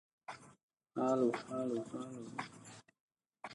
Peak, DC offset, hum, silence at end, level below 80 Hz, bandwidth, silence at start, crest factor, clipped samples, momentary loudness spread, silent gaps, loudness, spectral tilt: -22 dBFS; under 0.1%; none; 0 s; -82 dBFS; 11.5 kHz; 0.3 s; 20 dB; under 0.1%; 22 LU; 0.63-0.68 s, 3.00-3.08 s; -39 LUFS; -6 dB/octave